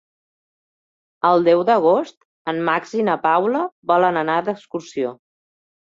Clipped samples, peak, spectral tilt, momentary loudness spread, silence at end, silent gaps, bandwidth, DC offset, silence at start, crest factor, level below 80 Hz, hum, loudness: under 0.1%; -2 dBFS; -6.5 dB/octave; 12 LU; 0.7 s; 2.17-2.45 s, 3.72-3.82 s; 7.6 kHz; under 0.1%; 1.25 s; 18 dB; -68 dBFS; none; -19 LUFS